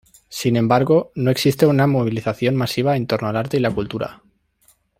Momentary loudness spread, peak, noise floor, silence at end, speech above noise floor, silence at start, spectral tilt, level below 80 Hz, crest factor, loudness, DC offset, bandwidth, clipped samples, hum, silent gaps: 9 LU; -2 dBFS; -59 dBFS; 0.85 s; 41 dB; 0.3 s; -6.5 dB/octave; -52 dBFS; 16 dB; -19 LUFS; under 0.1%; 16 kHz; under 0.1%; none; none